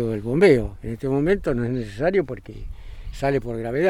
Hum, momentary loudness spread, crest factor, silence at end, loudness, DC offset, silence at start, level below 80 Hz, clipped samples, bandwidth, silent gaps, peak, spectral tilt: none; 22 LU; 18 dB; 0 s; -22 LUFS; under 0.1%; 0 s; -38 dBFS; under 0.1%; 12 kHz; none; -4 dBFS; -7.5 dB/octave